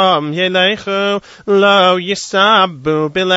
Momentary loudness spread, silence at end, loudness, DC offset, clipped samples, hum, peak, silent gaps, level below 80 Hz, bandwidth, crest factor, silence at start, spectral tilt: 7 LU; 0 s; -13 LUFS; under 0.1%; under 0.1%; none; 0 dBFS; none; -54 dBFS; 8 kHz; 12 dB; 0 s; -4 dB/octave